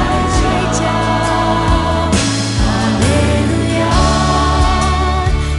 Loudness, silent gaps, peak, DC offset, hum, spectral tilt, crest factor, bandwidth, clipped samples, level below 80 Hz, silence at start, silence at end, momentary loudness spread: -14 LUFS; none; 0 dBFS; under 0.1%; none; -5 dB/octave; 12 dB; 11.5 kHz; under 0.1%; -20 dBFS; 0 s; 0 s; 2 LU